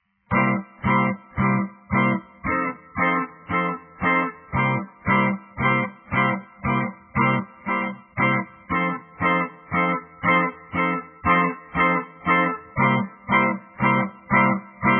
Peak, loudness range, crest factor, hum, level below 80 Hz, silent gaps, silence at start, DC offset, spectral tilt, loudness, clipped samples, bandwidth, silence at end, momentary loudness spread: -6 dBFS; 2 LU; 18 dB; none; -50 dBFS; none; 0.3 s; under 0.1%; -10.5 dB/octave; -22 LUFS; under 0.1%; 3.4 kHz; 0 s; 6 LU